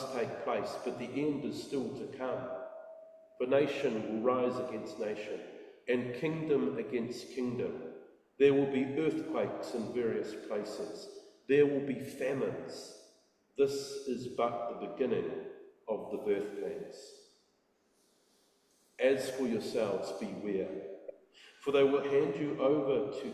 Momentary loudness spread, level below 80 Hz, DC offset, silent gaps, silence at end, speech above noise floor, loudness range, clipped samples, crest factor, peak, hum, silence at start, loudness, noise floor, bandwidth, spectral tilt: 17 LU; -74 dBFS; under 0.1%; none; 0 s; 40 dB; 5 LU; under 0.1%; 20 dB; -14 dBFS; none; 0 s; -34 LUFS; -73 dBFS; 13 kHz; -6 dB/octave